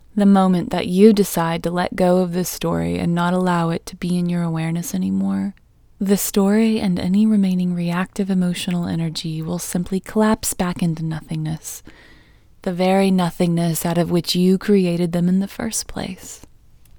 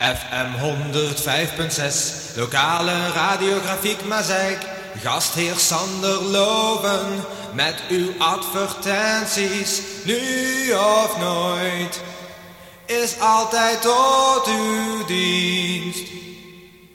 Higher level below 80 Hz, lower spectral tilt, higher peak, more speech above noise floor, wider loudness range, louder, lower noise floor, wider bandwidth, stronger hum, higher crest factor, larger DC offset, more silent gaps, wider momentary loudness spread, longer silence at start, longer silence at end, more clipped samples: first, -46 dBFS vs -54 dBFS; first, -6 dB/octave vs -2.5 dB/octave; first, 0 dBFS vs -4 dBFS; first, 30 dB vs 23 dB; about the same, 4 LU vs 3 LU; about the same, -19 LUFS vs -20 LUFS; first, -49 dBFS vs -44 dBFS; first, over 20 kHz vs 17 kHz; neither; about the same, 18 dB vs 16 dB; neither; neither; about the same, 10 LU vs 11 LU; first, 0.15 s vs 0 s; first, 0.6 s vs 0.25 s; neither